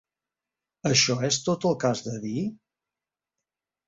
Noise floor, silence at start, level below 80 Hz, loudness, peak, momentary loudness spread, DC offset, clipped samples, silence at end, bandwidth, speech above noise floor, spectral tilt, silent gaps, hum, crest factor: -90 dBFS; 0.85 s; -64 dBFS; -25 LUFS; -8 dBFS; 11 LU; under 0.1%; under 0.1%; 1.3 s; 8 kHz; 65 dB; -3.5 dB/octave; none; none; 20 dB